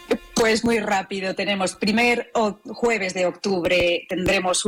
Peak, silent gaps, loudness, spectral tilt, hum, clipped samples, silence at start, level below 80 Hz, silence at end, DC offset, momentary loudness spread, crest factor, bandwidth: -12 dBFS; none; -21 LUFS; -3.5 dB/octave; none; under 0.1%; 0 s; -48 dBFS; 0 s; under 0.1%; 5 LU; 10 dB; 17.5 kHz